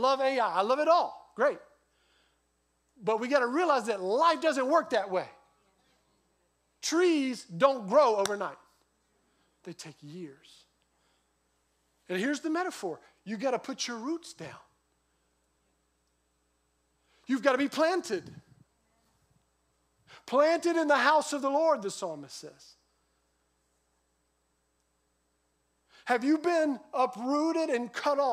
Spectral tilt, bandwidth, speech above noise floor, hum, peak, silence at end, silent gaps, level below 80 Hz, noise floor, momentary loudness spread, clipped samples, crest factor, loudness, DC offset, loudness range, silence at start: -3.5 dB/octave; 15.5 kHz; 47 dB; none; -10 dBFS; 0 s; none; -80 dBFS; -75 dBFS; 20 LU; under 0.1%; 22 dB; -28 LUFS; under 0.1%; 11 LU; 0 s